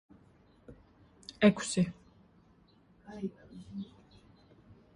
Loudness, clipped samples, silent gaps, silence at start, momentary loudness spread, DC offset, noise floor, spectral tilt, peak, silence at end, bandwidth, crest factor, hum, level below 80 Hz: -32 LUFS; under 0.1%; none; 0.7 s; 24 LU; under 0.1%; -64 dBFS; -5.5 dB/octave; -12 dBFS; 1.1 s; 11.5 kHz; 26 dB; none; -64 dBFS